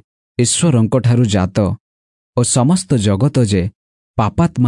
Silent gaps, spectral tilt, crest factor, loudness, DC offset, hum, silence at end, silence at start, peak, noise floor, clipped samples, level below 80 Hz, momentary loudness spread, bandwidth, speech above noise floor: 1.80-2.33 s, 3.75-4.14 s; -5.5 dB/octave; 12 dB; -15 LUFS; under 0.1%; none; 0 s; 0.4 s; -4 dBFS; under -90 dBFS; under 0.1%; -44 dBFS; 11 LU; 11 kHz; over 77 dB